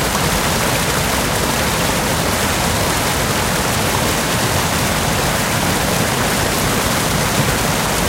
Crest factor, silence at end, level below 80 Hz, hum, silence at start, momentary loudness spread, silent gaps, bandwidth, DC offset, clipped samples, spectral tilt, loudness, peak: 14 dB; 0 s; -30 dBFS; none; 0 s; 1 LU; none; 16 kHz; under 0.1%; under 0.1%; -3.5 dB/octave; -16 LUFS; -2 dBFS